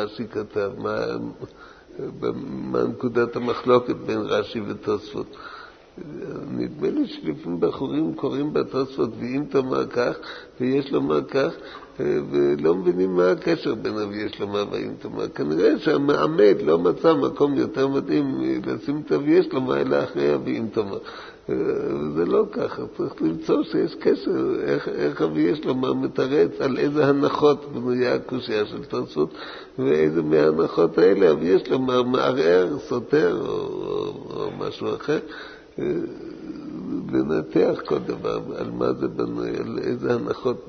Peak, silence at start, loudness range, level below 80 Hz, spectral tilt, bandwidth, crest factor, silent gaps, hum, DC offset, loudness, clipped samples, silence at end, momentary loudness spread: -4 dBFS; 0 s; 7 LU; -56 dBFS; -7.5 dB/octave; 6.6 kHz; 18 dB; none; none; under 0.1%; -23 LUFS; under 0.1%; 0 s; 12 LU